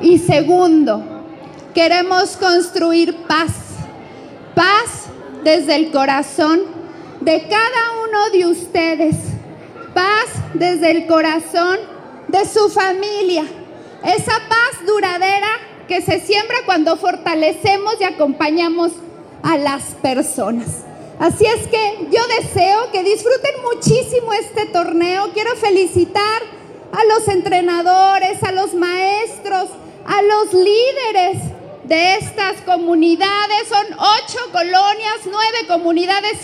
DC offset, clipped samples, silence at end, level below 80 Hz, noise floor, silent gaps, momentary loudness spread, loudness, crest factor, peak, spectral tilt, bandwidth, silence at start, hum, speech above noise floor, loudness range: under 0.1%; under 0.1%; 0 s; -50 dBFS; -35 dBFS; none; 11 LU; -15 LUFS; 14 dB; 0 dBFS; -4.5 dB/octave; 14 kHz; 0 s; none; 20 dB; 2 LU